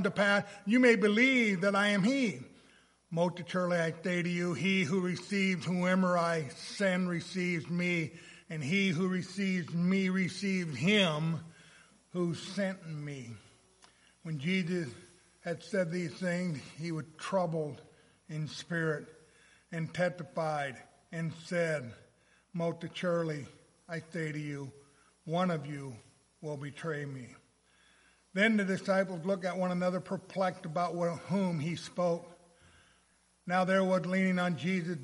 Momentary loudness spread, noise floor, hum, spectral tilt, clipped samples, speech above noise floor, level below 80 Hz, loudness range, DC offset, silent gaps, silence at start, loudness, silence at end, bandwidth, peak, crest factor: 15 LU; -69 dBFS; none; -6 dB/octave; under 0.1%; 37 dB; -76 dBFS; 7 LU; under 0.1%; none; 0 s; -32 LUFS; 0 s; 11.5 kHz; -14 dBFS; 20 dB